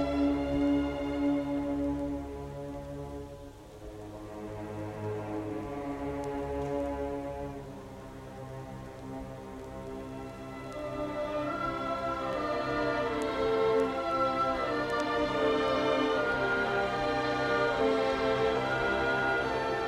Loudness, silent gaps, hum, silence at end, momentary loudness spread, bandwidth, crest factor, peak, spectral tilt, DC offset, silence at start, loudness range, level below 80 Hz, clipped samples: -31 LUFS; none; none; 0 s; 15 LU; 14 kHz; 16 dB; -16 dBFS; -6 dB/octave; under 0.1%; 0 s; 12 LU; -50 dBFS; under 0.1%